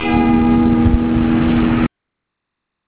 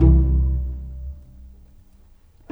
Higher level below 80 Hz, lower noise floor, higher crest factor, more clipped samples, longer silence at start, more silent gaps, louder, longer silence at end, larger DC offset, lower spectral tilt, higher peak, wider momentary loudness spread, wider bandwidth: about the same, -26 dBFS vs -22 dBFS; first, -78 dBFS vs -50 dBFS; about the same, 14 dB vs 18 dB; neither; about the same, 0 s vs 0 s; neither; first, -14 LUFS vs -21 LUFS; about the same, 1 s vs 1.05 s; neither; about the same, -11.5 dB/octave vs -12 dB/octave; about the same, -2 dBFS vs -2 dBFS; second, 4 LU vs 21 LU; first, 4 kHz vs 1.4 kHz